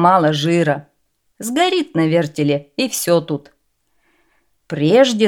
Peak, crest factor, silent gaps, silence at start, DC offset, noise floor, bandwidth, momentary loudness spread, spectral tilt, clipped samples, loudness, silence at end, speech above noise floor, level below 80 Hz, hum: 0 dBFS; 16 dB; none; 0 s; under 0.1%; -66 dBFS; 18.5 kHz; 13 LU; -5 dB/octave; under 0.1%; -17 LUFS; 0 s; 51 dB; -64 dBFS; none